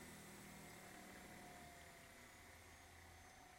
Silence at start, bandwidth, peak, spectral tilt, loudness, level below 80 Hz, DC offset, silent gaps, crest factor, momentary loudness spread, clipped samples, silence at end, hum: 0 s; 16.5 kHz; -46 dBFS; -3.5 dB/octave; -59 LUFS; -74 dBFS; under 0.1%; none; 14 dB; 4 LU; under 0.1%; 0 s; none